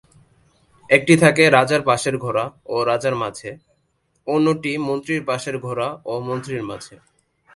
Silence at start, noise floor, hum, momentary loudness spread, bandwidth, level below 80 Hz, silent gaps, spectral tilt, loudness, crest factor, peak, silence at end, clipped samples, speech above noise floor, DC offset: 0.9 s; -67 dBFS; none; 15 LU; 11.5 kHz; -58 dBFS; none; -5 dB/octave; -19 LUFS; 20 dB; 0 dBFS; 0.6 s; under 0.1%; 48 dB; under 0.1%